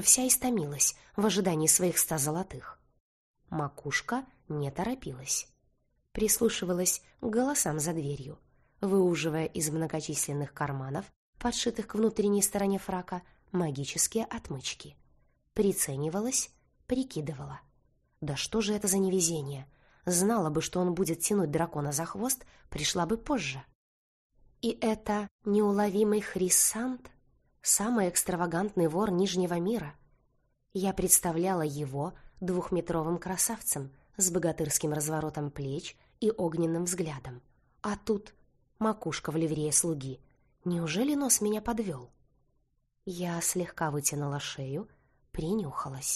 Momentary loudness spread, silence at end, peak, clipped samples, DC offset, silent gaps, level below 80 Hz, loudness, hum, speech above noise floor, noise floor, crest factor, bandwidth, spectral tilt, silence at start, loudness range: 13 LU; 0 s; -8 dBFS; under 0.1%; under 0.1%; 3.00-3.34 s, 11.16-11.33 s, 23.75-24.30 s, 25.31-25.39 s; -56 dBFS; -30 LUFS; none; 43 dB; -74 dBFS; 24 dB; 13 kHz; -4 dB/octave; 0 s; 5 LU